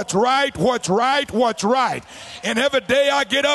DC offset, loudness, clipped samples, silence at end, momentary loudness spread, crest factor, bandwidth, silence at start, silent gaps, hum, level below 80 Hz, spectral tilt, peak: under 0.1%; -19 LUFS; under 0.1%; 0 s; 6 LU; 14 dB; 12.5 kHz; 0 s; none; none; -52 dBFS; -3.5 dB/octave; -6 dBFS